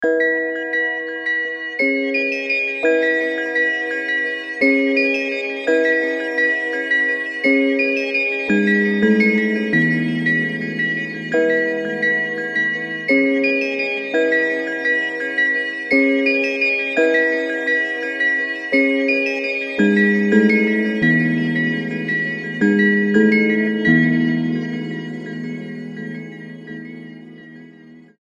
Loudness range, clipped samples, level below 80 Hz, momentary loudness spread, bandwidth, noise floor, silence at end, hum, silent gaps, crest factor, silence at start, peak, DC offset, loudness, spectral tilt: 2 LU; under 0.1%; -64 dBFS; 8 LU; 10 kHz; -43 dBFS; 0.3 s; none; none; 16 dB; 0 s; -2 dBFS; under 0.1%; -17 LUFS; -6.5 dB/octave